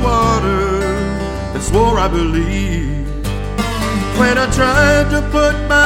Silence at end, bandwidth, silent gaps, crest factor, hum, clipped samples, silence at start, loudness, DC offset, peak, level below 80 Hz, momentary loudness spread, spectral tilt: 0 s; 16.5 kHz; none; 14 dB; none; under 0.1%; 0 s; -15 LUFS; under 0.1%; 0 dBFS; -22 dBFS; 10 LU; -5 dB/octave